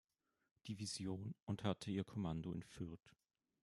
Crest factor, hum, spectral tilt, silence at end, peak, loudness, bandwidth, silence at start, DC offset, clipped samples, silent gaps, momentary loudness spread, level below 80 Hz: 22 dB; none; -5.5 dB/octave; 0.55 s; -24 dBFS; -47 LUFS; 12.5 kHz; 0.65 s; under 0.1%; under 0.1%; 1.43-1.47 s; 9 LU; -72 dBFS